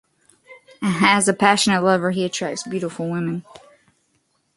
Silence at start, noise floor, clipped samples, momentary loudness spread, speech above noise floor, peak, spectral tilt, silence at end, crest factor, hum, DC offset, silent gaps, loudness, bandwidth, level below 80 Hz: 0.5 s; -67 dBFS; under 0.1%; 11 LU; 47 dB; 0 dBFS; -4 dB/octave; 1.15 s; 22 dB; none; under 0.1%; none; -19 LUFS; 11.5 kHz; -62 dBFS